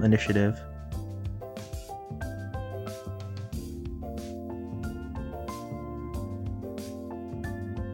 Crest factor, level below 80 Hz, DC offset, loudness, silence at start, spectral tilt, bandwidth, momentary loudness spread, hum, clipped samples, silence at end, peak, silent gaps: 22 dB; -44 dBFS; under 0.1%; -34 LUFS; 0 s; -7 dB/octave; 16.5 kHz; 10 LU; none; under 0.1%; 0 s; -10 dBFS; none